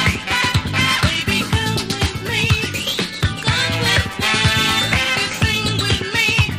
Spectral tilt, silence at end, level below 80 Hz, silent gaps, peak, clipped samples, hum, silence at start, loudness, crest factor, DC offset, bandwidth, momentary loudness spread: -3.5 dB/octave; 0 s; -32 dBFS; none; -2 dBFS; under 0.1%; none; 0 s; -17 LUFS; 16 dB; under 0.1%; 15.5 kHz; 5 LU